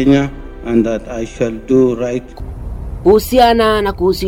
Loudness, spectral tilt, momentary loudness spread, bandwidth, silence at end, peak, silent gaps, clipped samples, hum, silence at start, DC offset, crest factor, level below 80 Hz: -14 LUFS; -6 dB/octave; 18 LU; 17 kHz; 0 s; -2 dBFS; none; under 0.1%; none; 0 s; under 0.1%; 12 dB; -30 dBFS